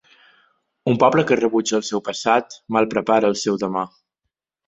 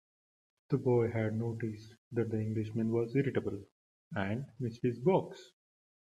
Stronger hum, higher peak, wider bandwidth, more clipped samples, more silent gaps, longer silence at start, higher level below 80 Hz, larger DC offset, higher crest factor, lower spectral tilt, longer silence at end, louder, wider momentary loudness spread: neither; first, -2 dBFS vs -16 dBFS; second, 8.2 kHz vs 9.2 kHz; neither; second, none vs 1.98-2.11 s, 3.72-4.11 s; first, 0.85 s vs 0.7 s; first, -62 dBFS vs -70 dBFS; neither; about the same, 18 dB vs 18 dB; second, -5 dB/octave vs -9 dB/octave; about the same, 0.8 s vs 0.7 s; first, -20 LUFS vs -34 LUFS; second, 9 LU vs 12 LU